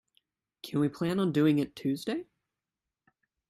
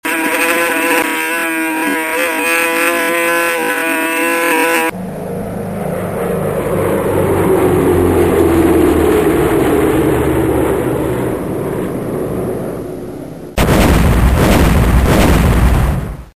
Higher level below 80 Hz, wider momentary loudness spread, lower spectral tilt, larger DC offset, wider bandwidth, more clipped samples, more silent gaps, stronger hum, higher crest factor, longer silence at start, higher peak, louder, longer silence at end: second, -70 dBFS vs -22 dBFS; about the same, 11 LU vs 10 LU; first, -7 dB/octave vs -5.5 dB/octave; second, under 0.1% vs 0.5%; about the same, 15 kHz vs 15.5 kHz; neither; neither; neither; first, 18 dB vs 12 dB; first, 0.65 s vs 0.05 s; second, -14 dBFS vs 0 dBFS; second, -30 LUFS vs -13 LUFS; first, 1.25 s vs 0.1 s